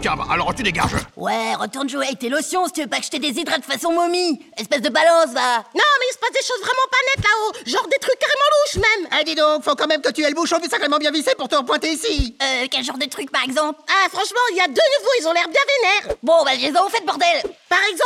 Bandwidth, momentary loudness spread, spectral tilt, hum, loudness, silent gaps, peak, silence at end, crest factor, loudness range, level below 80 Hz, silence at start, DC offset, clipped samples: 16 kHz; 7 LU; -2.5 dB/octave; none; -18 LUFS; none; -4 dBFS; 0 s; 16 dB; 4 LU; -42 dBFS; 0 s; under 0.1%; under 0.1%